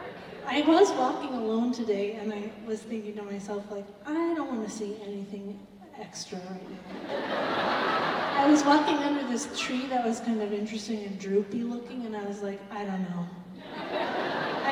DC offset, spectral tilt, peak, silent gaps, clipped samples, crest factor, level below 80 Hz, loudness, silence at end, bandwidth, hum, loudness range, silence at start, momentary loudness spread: under 0.1%; -4.5 dB/octave; -10 dBFS; none; under 0.1%; 20 dB; -68 dBFS; -29 LUFS; 0 s; 12 kHz; none; 9 LU; 0 s; 17 LU